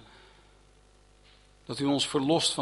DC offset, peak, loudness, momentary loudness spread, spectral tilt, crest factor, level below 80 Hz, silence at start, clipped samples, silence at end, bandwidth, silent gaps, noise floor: under 0.1%; -12 dBFS; -28 LUFS; 16 LU; -4 dB/octave; 20 dB; -62 dBFS; 1.7 s; under 0.1%; 0 s; 11.5 kHz; none; -59 dBFS